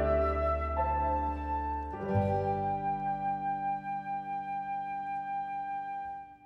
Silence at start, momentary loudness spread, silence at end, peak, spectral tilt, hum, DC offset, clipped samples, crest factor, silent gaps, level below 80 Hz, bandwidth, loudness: 0 s; 7 LU; 0 s; -16 dBFS; -9.5 dB/octave; none; under 0.1%; under 0.1%; 16 dB; none; -42 dBFS; 5.6 kHz; -33 LUFS